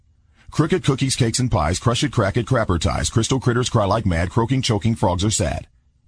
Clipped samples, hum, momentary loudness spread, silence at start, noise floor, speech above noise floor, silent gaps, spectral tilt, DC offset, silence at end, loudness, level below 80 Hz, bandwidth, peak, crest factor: under 0.1%; none; 2 LU; 0.5 s; -48 dBFS; 29 dB; none; -5 dB/octave; under 0.1%; 0.45 s; -20 LUFS; -36 dBFS; 10.5 kHz; -4 dBFS; 16 dB